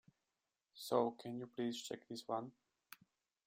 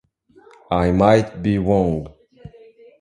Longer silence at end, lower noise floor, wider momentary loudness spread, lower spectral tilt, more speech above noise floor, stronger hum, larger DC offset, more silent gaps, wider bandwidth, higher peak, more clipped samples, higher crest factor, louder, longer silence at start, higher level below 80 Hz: first, 0.95 s vs 0.5 s; first, under -90 dBFS vs -51 dBFS; first, 23 LU vs 11 LU; second, -5 dB/octave vs -8 dB/octave; first, over 48 dB vs 34 dB; neither; neither; neither; first, 16 kHz vs 10.5 kHz; second, -22 dBFS vs 0 dBFS; neither; about the same, 24 dB vs 20 dB; second, -43 LUFS vs -18 LUFS; about the same, 0.75 s vs 0.7 s; second, -86 dBFS vs -38 dBFS